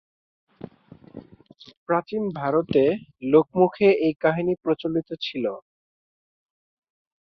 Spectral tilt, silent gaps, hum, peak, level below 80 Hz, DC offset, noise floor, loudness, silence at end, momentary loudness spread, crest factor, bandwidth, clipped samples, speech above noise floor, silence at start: -8.5 dB/octave; 1.77-1.86 s; none; -4 dBFS; -62 dBFS; under 0.1%; -50 dBFS; -23 LUFS; 1.65 s; 23 LU; 20 dB; 6 kHz; under 0.1%; 28 dB; 1.15 s